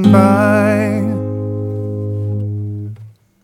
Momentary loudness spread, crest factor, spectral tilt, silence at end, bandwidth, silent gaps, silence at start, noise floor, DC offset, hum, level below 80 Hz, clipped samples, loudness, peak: 15 LU; 14 dB; -8 dB/octave; 0.35 s; 15 kHz; none; 0 s; -38 dBFS; under 0.1%; none; -50 dBFS; under 0.1%; -16 LUFS; 0 dBFS